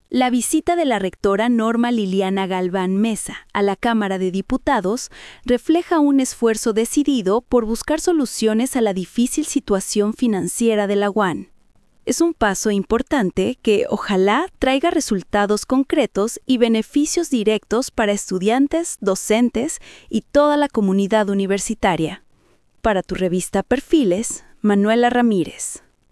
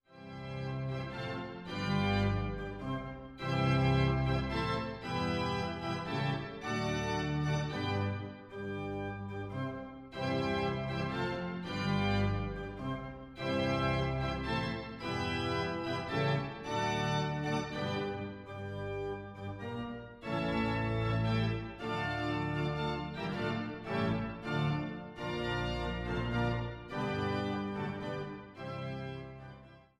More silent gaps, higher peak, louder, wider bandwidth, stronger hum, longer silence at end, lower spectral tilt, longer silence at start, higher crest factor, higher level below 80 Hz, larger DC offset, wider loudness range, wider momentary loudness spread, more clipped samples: neither; first, -2 dBFS vs -18 dBFS; first, -19 LUFS vs -35 LUFS; first, 12 kHz vs 10.5 kHz; neither; first, 0.35 s vs 0.15 s; second, -4.5 dB/octave vs -6.5 dB/octave; about the same, 0.1 s vs 0.1 s; about the same, 16 dB vs 16 dB; first, -44 dBFS vs -50 dBFS; neither; about the same, 2 LU vs 4 LU; second, 6 LU vs 10 LU; neither